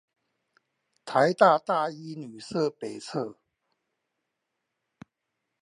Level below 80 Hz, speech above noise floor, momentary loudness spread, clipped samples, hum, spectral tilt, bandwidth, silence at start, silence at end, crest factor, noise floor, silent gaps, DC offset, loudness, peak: -78 dBFS; 57 dB; 19 LU; under 0.1%; none; -5.5 dB/octave; 11.5 kHz; 1.05 s; 2.3 s; 24 dB; -83 dBFS; none; under 0.1%; -26 LUFS; -4 dBFS